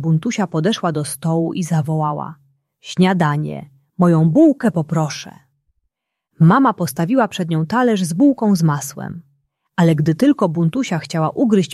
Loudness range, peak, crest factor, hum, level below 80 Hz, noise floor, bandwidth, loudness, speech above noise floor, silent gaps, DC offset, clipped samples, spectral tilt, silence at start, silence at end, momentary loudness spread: 3 LU; -2 dBFS; 14 dB; none; -58 dBFS; -74 dBFS; 13 kHz; -17 LUFS; 58 dB; none; under 0.1%; under 0.1%; -6.5 dB/octave; 0 s; 0 s; 14 LU